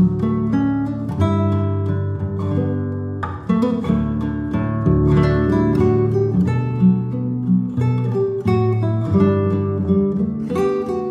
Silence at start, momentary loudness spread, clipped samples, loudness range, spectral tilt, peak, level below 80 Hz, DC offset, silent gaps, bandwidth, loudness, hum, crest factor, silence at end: 0 s; 6 LU; under 0.1%; 3 LU; -10 dB/octave; -4 dBFS; -38 dBFS; under 0.1%; none; 7.6 kHz; -19 LUFS; none; 14 dB; 0 s